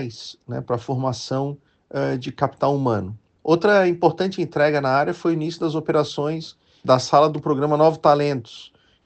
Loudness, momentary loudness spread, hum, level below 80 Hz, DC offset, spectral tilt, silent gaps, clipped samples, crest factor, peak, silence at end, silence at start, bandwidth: -21 LUFS; 15 LU; none; -62 dBFS; under 0.1%; -6.5 dB/octave; none; under 0.1%; 18 dB; -2 dBFS; 0.4 s; 0 s; 8.6 kHz